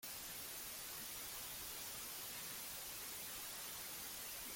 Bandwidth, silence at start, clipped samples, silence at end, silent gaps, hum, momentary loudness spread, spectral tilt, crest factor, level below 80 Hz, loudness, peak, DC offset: 17 kHz; 0 s; under 0.1%; 0 s; none; none; 1 LU; 0 dB/octave; 12 dB; -72 dBFS; -46 LUFS; -36 dBFS; under 0.1%